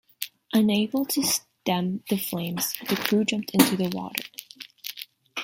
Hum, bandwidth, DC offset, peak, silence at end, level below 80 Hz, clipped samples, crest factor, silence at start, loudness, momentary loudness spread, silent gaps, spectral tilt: none; 17 kHz; under 0.1%; 0 dBFS; 0 s; -66 dBFS; under 0.1%; 26 dB; 0.2 s; -25 LUFS; 15 LU; none; -4 dB/octave